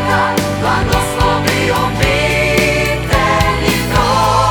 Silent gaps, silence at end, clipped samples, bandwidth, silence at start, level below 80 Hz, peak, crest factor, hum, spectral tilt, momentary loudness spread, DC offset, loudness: none; 0 s; under 0.1%; over 20 kHz; 0 s; -24 dBFS; 0 dBFS; 12 dB; none; -4.5 dB/octave; 3 LU; under 0.1%; -13 LUFS